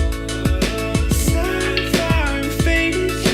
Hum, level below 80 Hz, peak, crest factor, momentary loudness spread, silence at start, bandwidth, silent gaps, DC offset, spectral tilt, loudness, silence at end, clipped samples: none; -24 dBFS; -2 dBFS; 16 dB; 4 LU; 0 s; 16.5 kHz; none; under 0.1%; -4.5 dB/octave; -19 LUFS; 0 s; under 0.1%